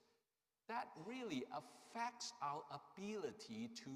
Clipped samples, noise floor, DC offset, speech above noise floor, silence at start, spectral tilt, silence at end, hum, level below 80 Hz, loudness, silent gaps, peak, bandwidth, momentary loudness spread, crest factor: under 0.1%; under -90 dBFS; under 0.1%; over 40 dB; 0.7 s; -4 dB/octave; 0 s; none; under -90 dBFS; -49 LUFS; none; -32 dBFS; 15.5 kHz; 7 LU; 18 dB